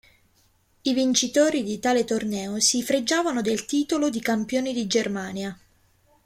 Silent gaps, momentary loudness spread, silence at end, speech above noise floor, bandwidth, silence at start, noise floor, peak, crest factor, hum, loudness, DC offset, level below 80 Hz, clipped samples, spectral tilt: none; 8 LU; 0.7 s; 40 dB; 16 kHz; 0.85 s; -63 dBFS; -6 dBFS; 18 dB; none; -24 LUFS; under 0.1%; -62 dBFS; under 0.1%; -3 dB/octave